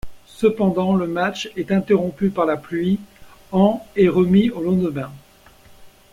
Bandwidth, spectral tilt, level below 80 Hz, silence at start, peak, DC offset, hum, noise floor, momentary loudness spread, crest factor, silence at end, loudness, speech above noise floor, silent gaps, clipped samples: 11.5 kHz; -7.5 dB/octave; -50 dBFS; 0.05 s; -4 dBFS; under 0.1%; none; -48 dBFS; 8 LU; 16 dB; 0.25 s; -19 LUFS; 30 dB; none; under 0.1%